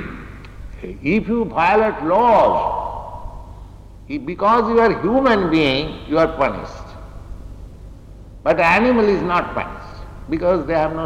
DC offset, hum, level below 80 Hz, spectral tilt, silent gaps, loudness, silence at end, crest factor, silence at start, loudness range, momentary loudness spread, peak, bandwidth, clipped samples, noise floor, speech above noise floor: under 0.1%; none; -36 dBFS; -7 dB/octave; none; -17 LUFS; 0 s; 12 dB; 0 s; 2 LU; 24 LU; -6 dBFS; 11 kHz; under 0.1%; -38 dBFS; 22 dB